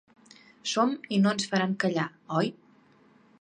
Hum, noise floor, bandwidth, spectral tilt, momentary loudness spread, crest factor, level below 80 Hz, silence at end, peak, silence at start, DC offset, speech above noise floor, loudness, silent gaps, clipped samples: none; -60 dBFS; 9.8 kHz; -5 dB/octave; 7 LU; 18 dB; -76 dBFS; 0.9 s; -12 dBFS; 0.65 s; under 0.1%; 33 dB; -28 LUFS; none; under 0.1%